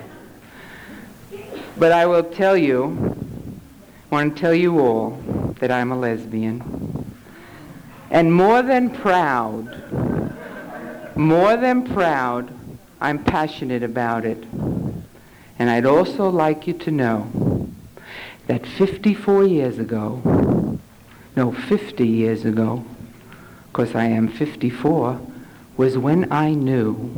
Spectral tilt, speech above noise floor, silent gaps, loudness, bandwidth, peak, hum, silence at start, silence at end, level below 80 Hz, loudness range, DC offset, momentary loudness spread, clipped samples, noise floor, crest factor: -8 dB/octave; 27 dB; none; -20 LUFS; over 20 kHz; -6 dBFS; none; 0 s; 0 s; -46 dBFS; 4 LU; under 0.1%; 20 LU; under 0.1%; -46 dBFS; 14 dB